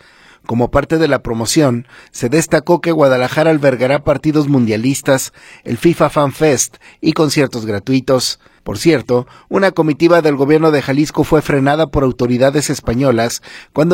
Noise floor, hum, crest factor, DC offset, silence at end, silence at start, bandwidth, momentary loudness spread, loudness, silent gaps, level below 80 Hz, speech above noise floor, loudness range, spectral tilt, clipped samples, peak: -33 dBFS; none; 14 dB; under 0.1%; 0 s; 0.5 s; 16.5 kHz; 8 LU; -14 LUFS; none; -38 dBFS; 20 dB; 2 LU; -5.5 dB/octave; under 0.1%; 0 dBFS